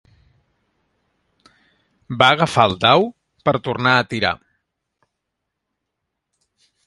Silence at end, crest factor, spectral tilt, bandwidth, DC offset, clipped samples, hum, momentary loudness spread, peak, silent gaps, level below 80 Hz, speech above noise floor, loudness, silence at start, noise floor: 2.5 s; 22 dB; -5 dB/octave; 11.5 kHz; under 0.1%; under 0.1%; none; 11 LU; 0 dBFS; none; -54 dBFS; 62 dB; -17 LUFS; 2.1 s; -79 dBFS